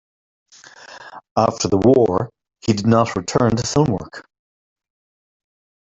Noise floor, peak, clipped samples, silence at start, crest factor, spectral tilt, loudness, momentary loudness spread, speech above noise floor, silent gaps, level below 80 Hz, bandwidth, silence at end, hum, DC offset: -42 dBFS; 0 dBFS; under 0.1%; 0.9 s; 20 dB; -6 dB/octave; -18 LUFS; 23 LU; 25 dB; 1.31-1.36 s; -48 dBFS; 8.2 kHz; 1.65 s; none; under 0.1%